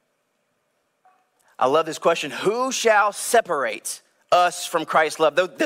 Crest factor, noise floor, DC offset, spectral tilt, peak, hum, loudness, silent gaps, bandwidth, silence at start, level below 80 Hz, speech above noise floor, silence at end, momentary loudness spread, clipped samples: 16 dB; -71 dBFS; under 0.1%; -2.5 dB/octave; -6 dBFS; none; -21 LUFS; none; 16 kHz; 1.6 s; -74 dBFS; 50 dB; 0 s; 8 LU; under 0.1%